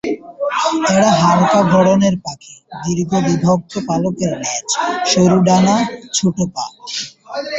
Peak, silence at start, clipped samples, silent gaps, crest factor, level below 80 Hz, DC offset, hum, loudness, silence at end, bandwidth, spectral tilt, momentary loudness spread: 0 dBFS; 0.05 s; under 0.1%; none; 14 dB; -50 dBFS; under 0.1%; none; -15 LUFS; 0 s; 8.2 kHz; -5 dB/octave; 13 LU